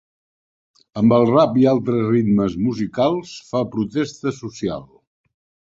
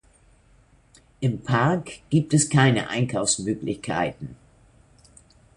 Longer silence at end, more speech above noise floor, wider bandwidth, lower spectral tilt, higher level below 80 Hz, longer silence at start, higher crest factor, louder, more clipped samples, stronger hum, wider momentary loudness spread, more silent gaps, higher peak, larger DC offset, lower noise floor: second, 0.95 s vs 1.25 s; first, over 72 dB vs 34 dB; second, 7.8 kHz vs 11.5 kHz; first, -7.5 dB/octave vs -5 dB/octave; about the same, -52 dBFS vs -54 dBFS; second, 0.95 s vs 1.2 s; about the same, 18 dB vs 22 dB; first, -19 LUFS vs -23 LUFS; neither; neither; about the same, 12 LU vs 10 LU; neither; about the same, -2 dBFS vs -2 dBFS; neither; first, under -90 dBFS vs -57 dBFS